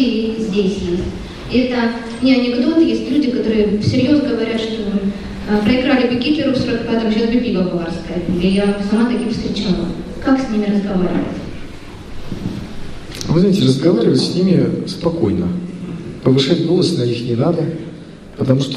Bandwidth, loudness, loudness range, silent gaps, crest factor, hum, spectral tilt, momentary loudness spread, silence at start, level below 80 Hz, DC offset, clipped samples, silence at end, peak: 11.5 kHz; -17 LUFS; 4 LU; none; 16 dB; none; -7 dB/octave; 14 LU; 0 s; -36 dBFS; under 0.1%; under 0.1%; 0 s; 0 dBFS